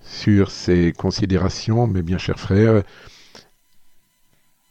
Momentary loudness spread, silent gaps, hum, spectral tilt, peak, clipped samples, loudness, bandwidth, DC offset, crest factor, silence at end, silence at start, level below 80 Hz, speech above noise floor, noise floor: 7 LU; none; none; -7 dB/octave; -4 dBFS; under 0.1%; -19 LUFS; 8.2 kHz; under 0.1%; 16 dB; 1.6 s; 0.05 s; -42 dBFS; 41 dB; -59 dBFS